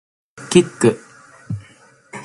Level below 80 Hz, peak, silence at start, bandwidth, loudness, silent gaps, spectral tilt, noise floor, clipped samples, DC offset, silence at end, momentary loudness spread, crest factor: -54 dBFS; 0 dBFS; 0.4 s; 11.5 kHz; -16 LUFS; none; -5.5 dB/octave; -49 dBFS; under 0.1%; under 0.1%; 0 s; 21 LU; 20 dB